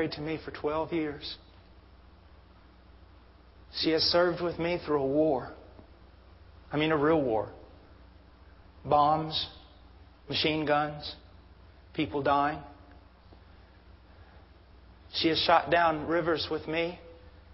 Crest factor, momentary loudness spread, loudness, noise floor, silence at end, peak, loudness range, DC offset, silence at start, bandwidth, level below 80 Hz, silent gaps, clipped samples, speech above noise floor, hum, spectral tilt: 22 dB; 17 LU; -29 LUFS; -55 dBFS; 0 s; -10 dBFS; 6 LU; under 0.1%; 0 s; 5.8 kHz; -54 dBFS; none; under 0.1%; 27 dB; none; -8.5 dB/octave